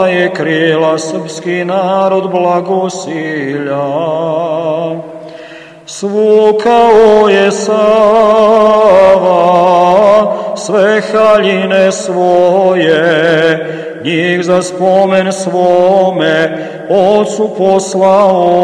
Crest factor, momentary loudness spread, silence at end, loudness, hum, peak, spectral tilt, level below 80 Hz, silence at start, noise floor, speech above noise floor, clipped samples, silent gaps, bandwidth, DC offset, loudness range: 10 dB; 10 LU; 0 s; -9 LUFS; none; 0 dBFS; -5 dB/octave; -50 dBFS; 0 s; -31 dBFS; 22 dB; 1%; none; 11 kHz; under 0.1%; 7 LU